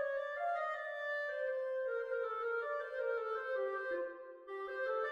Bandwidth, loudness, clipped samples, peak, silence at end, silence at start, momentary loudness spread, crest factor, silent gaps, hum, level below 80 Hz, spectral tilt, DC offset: 7.2 kHz; -39 LUFS; under 0.1%; -28 dBFS; 0 s; 0 s; 5 LU; 12 dB; none; none; -80 dBFS; -3 dB/octave; under 0.1%